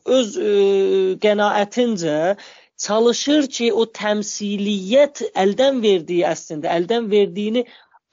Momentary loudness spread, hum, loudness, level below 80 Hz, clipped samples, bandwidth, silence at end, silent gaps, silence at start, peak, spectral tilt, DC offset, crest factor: 6 LU; none; -19 LUFS; -70 dBFS; under 0.1%; 7.6 kHz; 0.5 s; none; 0.05 s; -4 dBFS; -3.5 dB/octave; under 0.1%; 14 dB